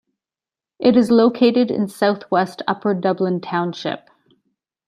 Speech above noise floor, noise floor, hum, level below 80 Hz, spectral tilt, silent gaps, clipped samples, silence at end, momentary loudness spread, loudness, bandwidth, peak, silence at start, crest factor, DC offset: over 73 dB; under -90 dBFS; none; -64 dBFS; -7 dB/octave; none; under 0.1%; 0.9 s; 10 LU; -18 LUFS; 13.5 kHz; -2 dBFS; 0.8 s; 16 dB; under 0.1%